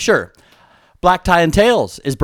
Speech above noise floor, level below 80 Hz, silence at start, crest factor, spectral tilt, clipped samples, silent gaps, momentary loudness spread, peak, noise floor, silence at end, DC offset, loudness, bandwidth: 36 dB; -34 dBFS; 0 s; 16 dB; -4.5 dB/octave; under 0.1%; none; 8 LU; 0 dBFS; -50 dBFS; 0 s; under 0.1%; -14 LUFS; 19.5 kHz